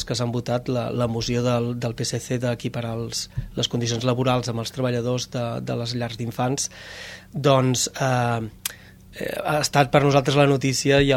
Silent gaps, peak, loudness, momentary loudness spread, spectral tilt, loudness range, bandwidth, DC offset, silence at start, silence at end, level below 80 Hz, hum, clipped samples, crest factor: none; -2 dBFS; -23 LUFS; 11 LU; -5 dB/octave; 4 LU; 16.5 kHz; under 0.1%; 0 s; 0 s; -46 dBFS; none; under 0.1%; 22 dB